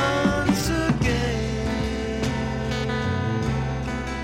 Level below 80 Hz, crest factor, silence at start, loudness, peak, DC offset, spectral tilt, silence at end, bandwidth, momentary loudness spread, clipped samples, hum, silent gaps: -34 dBFS; 16 dB; 0 s; -24 LUFS; -8 dBFS; under 0.1%; -5.5 dB/octave; 0 s; 16.5 kHz; 5 LU; under 0.1%; none; none